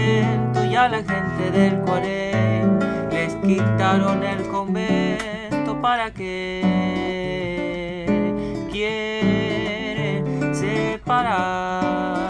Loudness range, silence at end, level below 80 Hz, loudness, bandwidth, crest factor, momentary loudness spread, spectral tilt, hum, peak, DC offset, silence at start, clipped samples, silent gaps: 3 LU; 0 s; -46 dBFS; -21 LUFS; 10.5 kHz; 16 dB; 7 LU; -6.5 dB/octave; none; -6 dBFS; under 0.1%; 0 s; under 0.1%; none